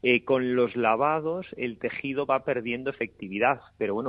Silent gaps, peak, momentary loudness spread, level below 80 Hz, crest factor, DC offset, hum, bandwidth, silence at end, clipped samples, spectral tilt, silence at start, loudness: none; -8 dBFS; 9 LU; -64 dBFS; 20 dB; under 0.1%; none; 5 kHz; 0 s; under 0.1%; -9 dB/octave; 0.05 s; -27 LUFS